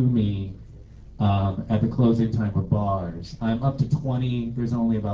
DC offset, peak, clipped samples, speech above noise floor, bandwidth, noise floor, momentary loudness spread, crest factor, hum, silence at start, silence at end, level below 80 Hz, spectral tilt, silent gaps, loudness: under 0.1%; -10 dBFS; under 0.1%; 20 dB; 7.4 kHz; -43 dBFS; 9 LU; 14 dB; none; 0 s; 0 s; -40 dBFS; -9.5 dB/octave; none; -24 LUFS